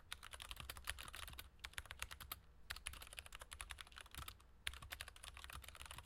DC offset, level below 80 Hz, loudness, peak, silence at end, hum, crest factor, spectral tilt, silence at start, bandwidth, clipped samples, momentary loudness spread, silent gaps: under 0.1%; -62 dBFS; -53 LUFS; -20 dBFS; 0 s; none; 34 dB; -1 dB/octave; 0 s; 17 kHz; under 0.1%; 5 LU; none